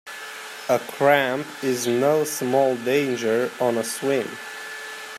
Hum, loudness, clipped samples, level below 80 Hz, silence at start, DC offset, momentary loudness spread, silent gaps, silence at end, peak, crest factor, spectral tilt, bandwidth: none; -22 LUFS; under 0.1%; -74 dBFS; 0.05 s; under 0.1%; 14 LU; none; 0 s; -4 dBFS; 20 dB; -4 dB/octave; 16 kHz